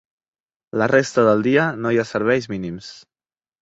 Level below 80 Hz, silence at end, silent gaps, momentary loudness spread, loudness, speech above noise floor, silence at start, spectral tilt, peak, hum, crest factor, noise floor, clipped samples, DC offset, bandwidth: -56 dBFS; 0.65 s; none; 14 LU; -19 LUFS; over 71 dB; 0.75 s; -6 dB/octave; -2 dBFS; none; 18 dB; under -90 dBFS; under 0.1%; under 0.1%; 8 kHz